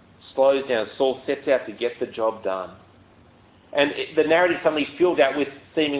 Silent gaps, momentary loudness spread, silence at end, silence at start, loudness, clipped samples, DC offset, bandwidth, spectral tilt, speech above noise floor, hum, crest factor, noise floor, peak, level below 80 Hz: none; 10 LU; 0 s; 0.25 s; -23 LUFS; under 0.1%; under 0.1%; 4 kHz; -8.5 dB/octave; 31 dB; none; 18 dB; -53 dBFS; -6 dBFS; -62 dBFS